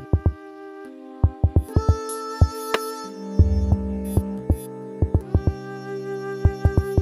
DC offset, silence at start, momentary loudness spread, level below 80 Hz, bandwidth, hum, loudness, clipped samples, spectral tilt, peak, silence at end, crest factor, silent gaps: under 0.1%; 0 s; 14 LU; -28 dBFS; 12.5 kHz; none; -24 LUFS; under 0.1%; -7.5 dB/octave; -4 dBFS; 0 s; 18 dB; none